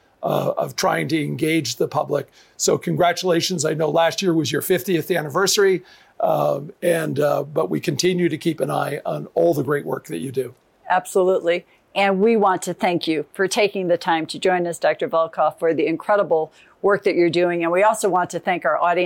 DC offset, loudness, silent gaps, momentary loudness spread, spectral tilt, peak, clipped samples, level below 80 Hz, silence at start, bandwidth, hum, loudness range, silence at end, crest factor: under 0.1%; -20 LUFS; none; 7 LU; -4.5 dB/octave; -8 dBFS; under 0.1%; -66 dBFS; 0.2 s; 17 kHz; none; 3 LU; 0 s; 14 dB